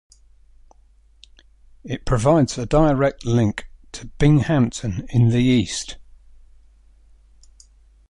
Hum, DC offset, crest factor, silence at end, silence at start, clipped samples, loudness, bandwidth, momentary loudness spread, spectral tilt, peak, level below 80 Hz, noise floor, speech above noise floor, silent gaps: none; under 0.1%; 18 dB; 2.05 s; 1.85 s; under 0.1%; -19 LUFS; 11.5 kHz; 18 LU; -6.5 dB/octave; -2 dBFS; -38 dBFS; -53 dBFS; 35 dB; none